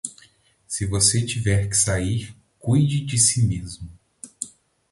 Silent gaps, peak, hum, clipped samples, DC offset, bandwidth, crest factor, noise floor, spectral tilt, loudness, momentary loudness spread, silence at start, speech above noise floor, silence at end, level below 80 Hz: none; -4 dBFS; none; under 0.1%; under 0.1%; 11.5 kHz; 20 dB; -56 dBFS; -4 dB/octave; -20 LUFS; 19 LU; 0.05 s; 35 dB; 0.45 s; -42 dBFS